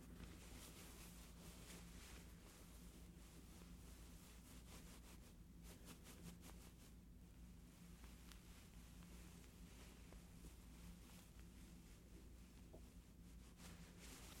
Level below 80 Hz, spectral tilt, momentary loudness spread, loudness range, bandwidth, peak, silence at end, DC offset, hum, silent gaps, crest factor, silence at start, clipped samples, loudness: -64 dBFS; -4 dB/octave; 5 LU; 2 LU; 16.5 kHz; -36 dBFS; 0 s; under 0.1%; none; none; 26 dB; 0 s; under 0.1%; -62 LUFS